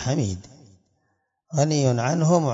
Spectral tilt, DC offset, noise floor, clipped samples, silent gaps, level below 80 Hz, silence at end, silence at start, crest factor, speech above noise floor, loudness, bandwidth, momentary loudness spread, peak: -6 dB/octave; under 0.1%; -72 dBFS; under 0.1%; none; -60 dBFS; 0 s; 0 s; 16 dB; 51 dB; -23 LUFS; 7.8 kHz; 10 LU; -8 dBFS